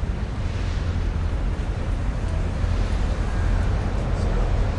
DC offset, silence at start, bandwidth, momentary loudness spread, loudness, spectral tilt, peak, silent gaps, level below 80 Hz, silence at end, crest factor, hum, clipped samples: under 0.1%; 0 s; 10 kHz; 3 LU; -26 LUFS; -7 dB/octave; -10 dBFS; none; -24 dBFS; 0 s; 12 dB; none; under 0.1%